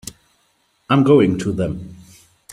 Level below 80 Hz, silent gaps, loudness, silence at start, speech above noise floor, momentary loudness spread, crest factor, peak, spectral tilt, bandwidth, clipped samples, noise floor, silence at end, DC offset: -48 dBFS; none; -16 LUFS; 0.05 s; 47 dB; 22 LU; 18 dB; -2 dBFS; -7 dB/octave; 15.5 kHz; under 0.1%; -63 dBFS; 0.6 s; under 0.1%